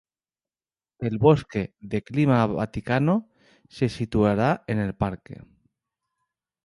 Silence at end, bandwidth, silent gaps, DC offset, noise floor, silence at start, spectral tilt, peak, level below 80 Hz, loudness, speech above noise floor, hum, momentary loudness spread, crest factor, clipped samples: 1.25 s; 11.5 kHz; none; under 0.1%; under -90 dBFS; 1 s; -8.5 dB/octave; -4 dBFS; -48 dBFS; -24 LUFS; over 67 dB; none; 11 LU; 22 dB; under 0.1%